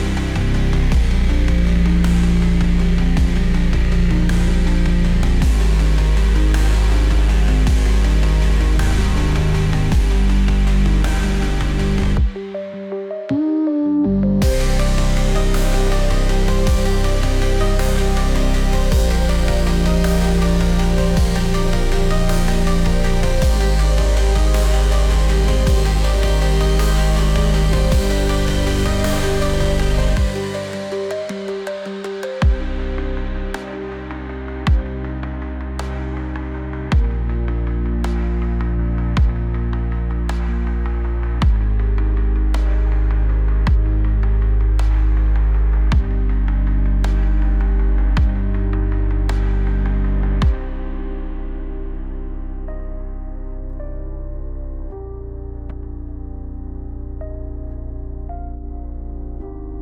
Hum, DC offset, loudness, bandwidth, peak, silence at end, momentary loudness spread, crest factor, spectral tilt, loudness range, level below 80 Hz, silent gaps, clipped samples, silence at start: none; under 0.1%; -19 LUFS; 14.5 kHz; -6 dBFS; 0 s; 14 LU; 8 dB; -6 dB/octave; 14 LU; -16 dBFS; none; under 0.1%; 0 s